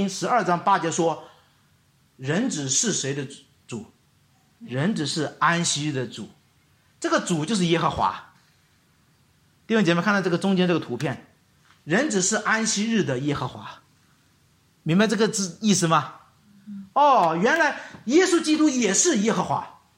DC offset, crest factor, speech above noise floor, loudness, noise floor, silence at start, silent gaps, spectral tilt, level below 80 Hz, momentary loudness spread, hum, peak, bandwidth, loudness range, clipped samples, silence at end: under 0.1%; 18 dB; 39 dB; -22 LUFS; -62 dBFS; 0 s; none; -4 dB/octave; -62 dBFS; 16 LU; none; -6 dBFS; 16 kHz; 6 LU; under 0.1%; 0.3 s